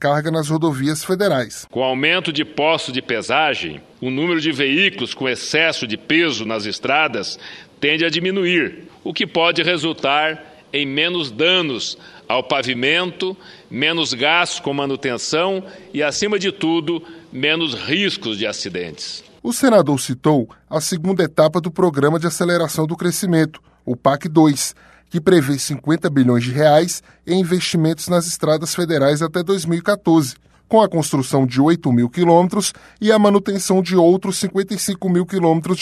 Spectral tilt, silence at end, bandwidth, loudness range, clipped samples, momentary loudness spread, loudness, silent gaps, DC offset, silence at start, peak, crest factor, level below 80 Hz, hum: -4.5 dB/octave; 0 s; 13.5 kHz; 3 LU; under 0.1%; 10 LU; -18 LUFS; none; under 0.1%; 0 s; 0 dBFS; 16 dB; -58 dBFS; none